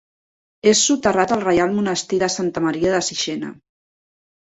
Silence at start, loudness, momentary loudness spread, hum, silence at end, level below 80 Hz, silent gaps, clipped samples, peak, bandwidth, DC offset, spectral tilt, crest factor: 0.65 s; -18 LUFS; 8 LU; none; 0.95 s; -52 dBFS; none; under 0.1%; -2 dBFS; 8.4 kHz; under 0.1%; -3.5 dB/octave; 18 dB